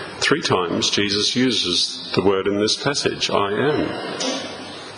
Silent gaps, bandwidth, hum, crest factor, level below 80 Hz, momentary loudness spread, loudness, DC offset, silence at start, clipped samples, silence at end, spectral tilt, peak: none; 10.5 kHz; none; 18 dB; -52 dBFS; 7 LU; -20 LUFS; under 0.1%; 0 s; under 0.1%; 0 s; -3 dB/octave; -2 dBFS